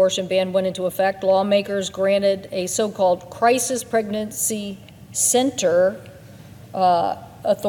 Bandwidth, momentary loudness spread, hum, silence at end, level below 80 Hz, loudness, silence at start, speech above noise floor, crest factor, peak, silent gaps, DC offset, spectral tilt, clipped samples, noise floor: 17.5 kHz; 9 LU; none; 0 s; -60 dBFS; -20 LUFS; 0 s; 22 dB; 16 dB; -6 dBFS; none; under 0.1%; -3.5 dB/octave; under 0.1%; -42 dBFS